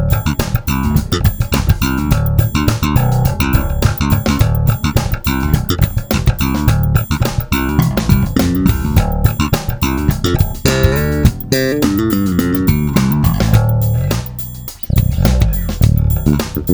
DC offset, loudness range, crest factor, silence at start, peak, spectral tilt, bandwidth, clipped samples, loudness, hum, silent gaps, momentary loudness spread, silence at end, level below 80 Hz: under 0.1%; 1 LU; 14 dB; 0 s; 0 dBFS; -6 dB/octave; over 20 kHz; 0.1%; -15 LUFS; none; none; 4 LU; 0 s; -20 dBFS